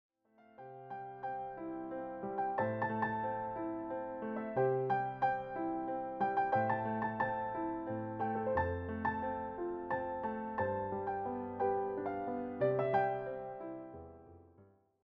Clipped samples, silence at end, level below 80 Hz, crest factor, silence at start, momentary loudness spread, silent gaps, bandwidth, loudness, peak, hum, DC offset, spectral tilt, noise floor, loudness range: under 0.1%; 0.4 s; -64 dBFS; 18 dB; 0.4 s; 11 LU; none; 5.8 kHz; -37 LUFS; -20 dBFS; none; under 0.1%; -6.5 dB/octave; -65 dBFS; 3 LU